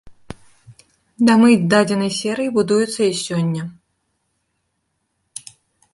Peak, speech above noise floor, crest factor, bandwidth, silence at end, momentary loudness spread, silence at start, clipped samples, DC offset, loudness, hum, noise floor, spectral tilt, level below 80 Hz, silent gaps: -2 dBFS; 55 dB; 18 dB; 11.5 kHz; 2.2 s; 23 LU; 0.05 s; under 0.1%; under 0.1%; -17 LUFS; none; -71 dBFS; -5.5 dB/octave; -58 dBFS; none